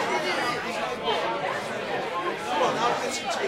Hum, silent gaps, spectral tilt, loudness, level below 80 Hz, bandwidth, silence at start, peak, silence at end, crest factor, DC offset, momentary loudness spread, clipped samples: none; none; -3 dB/octave; -27 LUFS; -62 dBFS; 16 kHz; 0 s; -10 dBFS; 0 s; 16 dB; under 0.1%; 5 LU; under 0.1%